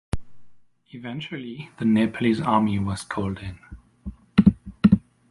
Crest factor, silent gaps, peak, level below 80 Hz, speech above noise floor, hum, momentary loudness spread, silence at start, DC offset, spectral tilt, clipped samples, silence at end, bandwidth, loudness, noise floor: 20 dB; none; -2 dBFS; -42 dBFS; 23 dB; none; 19 LU; 0.15 s; under 0.1%; -7.5 dB/octave; under 0.1%; 0.3 s; 11.5 kHz; -23 LUFS; -47 dBFS